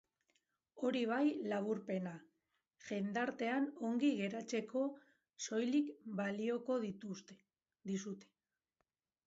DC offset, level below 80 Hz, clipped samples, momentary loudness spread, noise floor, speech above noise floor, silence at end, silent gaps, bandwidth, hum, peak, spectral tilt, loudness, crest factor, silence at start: under 0.1%; -86 dBFS; under 0.1%; 14 LU; -88 dBFS; 49 dB; 1.05 s; none; 8 kHz; none; -24 dBFS; -5 dB/octave; -40 LUFS; 16 dB; 0.75 s